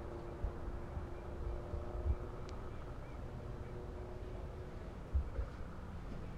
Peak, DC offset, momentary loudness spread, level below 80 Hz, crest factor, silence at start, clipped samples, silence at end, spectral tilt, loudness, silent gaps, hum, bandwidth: -24 dBFS; under 0.1%; 8 LU; -46 dBFS; 18 dB; 0 s; under 0.1%; 0 s; -8 dB/octave; -46 LUFS; none; none; 9.6 kHz